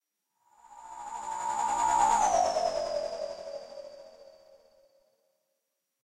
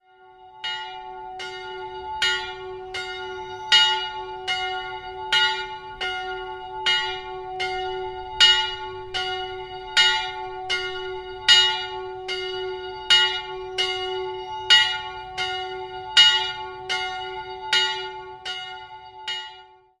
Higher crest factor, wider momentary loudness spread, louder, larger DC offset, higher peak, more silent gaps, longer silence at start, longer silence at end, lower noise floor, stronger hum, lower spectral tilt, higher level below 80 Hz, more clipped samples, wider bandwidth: about the same, 18 dB vs 22 dB; first, 22 LU vs 18 LU; second, -29 LUFS vs -21 LUFS; neither; second, -14 dBFS vs -2 dBFS; neither; first, 0.7 s vs 0.2 s; first, 1.75 s vs 0.35 s; first, -82 dBFS vs -50 dBFS; neither; about the same, -1.5 dB/octave vs -0.5 dB/octave; second, -60 dBFS vs -54 dBFS; neither; about the same, 13.5 kHz vs 13.5 kHz